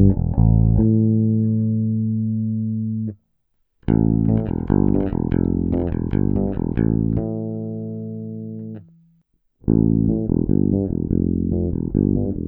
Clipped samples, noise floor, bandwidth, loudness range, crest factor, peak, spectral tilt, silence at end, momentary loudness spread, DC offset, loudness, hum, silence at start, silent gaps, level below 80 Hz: under 0.1%; -67 dBFS; 3.1 kHz; 4 LU; 16 dB; -4 dBFS; -14.5 dB/octave; 0 s; 13 LU; under 0.1%; -20 LUFS; none; 0 s; none; -30 dBFS